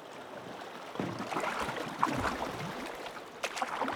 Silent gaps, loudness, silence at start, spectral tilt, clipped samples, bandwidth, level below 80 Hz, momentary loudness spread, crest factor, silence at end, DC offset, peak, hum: none; -37 LUFS; 0 s; -4 dB/octave; under 0.1%; over 20 kHz; -60 dBFS; 11 LU; 26 dB; 0 s; under 0.1%; -12 dBFS; none